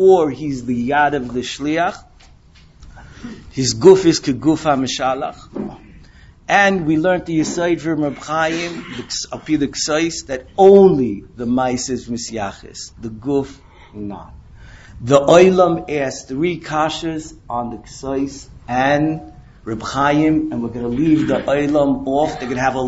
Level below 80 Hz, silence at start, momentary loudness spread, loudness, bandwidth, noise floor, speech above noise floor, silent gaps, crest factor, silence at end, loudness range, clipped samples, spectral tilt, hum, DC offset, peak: -44 dBFS; 0 s; 18 LU; -17 LUFS; 8 kHz; -46 dBFS; 30 dB; none; 18 dB; 0 s; 6 LU; under 0.1%; -5 dB/octave; none; under 0.1%; 0 dBFS